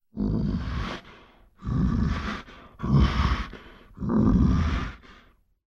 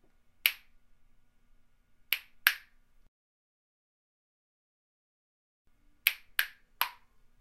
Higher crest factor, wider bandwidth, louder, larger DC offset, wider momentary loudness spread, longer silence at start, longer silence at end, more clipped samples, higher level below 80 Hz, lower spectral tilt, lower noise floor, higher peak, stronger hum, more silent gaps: second, 16 dB vs 38 dB; second, 7.2 kHz vs 16 kHz; first, -26 LUFS vs -31 LUFS; neither; first, 17 LU vs 9 LU; second, 0.15 s vs 0.45 s; about the same, 0.55 s vs 0.5 s; neither; first, -32 dBFS vs -68 dBFS; first, -8 dB/octave vs 3 dB/octave; second, -58 dBFS vs -63 dBFS; second, -10 dBFS vs 0 dBFS; neither; second, none vs 3.08-5.65 s